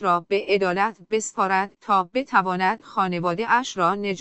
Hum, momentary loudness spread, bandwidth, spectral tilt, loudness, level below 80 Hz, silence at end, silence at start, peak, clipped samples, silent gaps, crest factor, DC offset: none; 4 LU; 8.4 kHz; -4.5 dB/octave; -22 LUFS; -64 dBFS; 0 s; 0 s; -6 dBFS; under 0.1%; none; 18 dB; under 0.1%